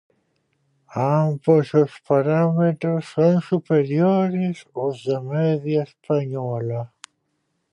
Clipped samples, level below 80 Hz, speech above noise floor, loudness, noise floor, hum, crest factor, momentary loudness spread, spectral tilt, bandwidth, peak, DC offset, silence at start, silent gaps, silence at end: under 0.1%; -68 dBFS; 52 dB; -21 LUFS; -72 dBFS; none; 16 dB; 9 LU; -9 dB/octave; 10 kHz; -4 dBFS; under 0.1%; 0.9 s; none; 0.85 s